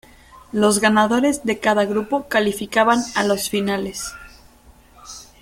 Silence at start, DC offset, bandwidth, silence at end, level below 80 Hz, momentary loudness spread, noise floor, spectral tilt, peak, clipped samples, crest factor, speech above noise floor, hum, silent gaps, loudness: 0.35 s; under 0.1%; 16.5 kHz; 0.2 s; -50 dBFS; 14 LU; -49 dBFS; -4 dB/octave; -2 dBFS; under 0.1%; 18 dB; 31 dB; none; none; -19 LUFS